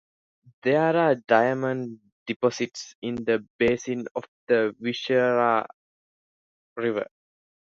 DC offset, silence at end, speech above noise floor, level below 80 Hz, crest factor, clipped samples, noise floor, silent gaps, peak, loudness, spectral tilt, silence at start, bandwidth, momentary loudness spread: under 0.1%; 0.7 s; over 66 dB; -62 dBFS; 20 dB; under 0.1%; under -90 dBFS; 2.12-2.26 s, 2.36-2.40 s, 2.95-3.02 s, 3.50-3.59 s, 4.11-4.15 s, 4.28-4.47 s, 5.74-6.76 s; -6 dBFS; -25 LUFS; -5.5 dB/octave; 0.65 s; 7.8 kHz; 14 LU